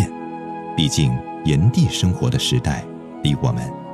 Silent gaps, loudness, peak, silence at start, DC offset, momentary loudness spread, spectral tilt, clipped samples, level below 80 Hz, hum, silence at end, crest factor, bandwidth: none; -20 LUFS; -4 dBFS; 0 s; under 0.1%; 12 LU; -5.5 dB/octave; under 0.1%; -38 dBFS; none; 0 s; 14 dB; 13.5 kHz